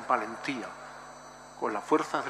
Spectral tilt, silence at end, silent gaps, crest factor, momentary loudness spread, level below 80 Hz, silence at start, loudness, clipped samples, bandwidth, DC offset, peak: -4 dB/octave; 0 s; none; 22 dB; 19 LU; -70 dBFS; 0 s; -32 LUFS; under 0.1%; 14 kHz; under 0.1%; -10 dBFS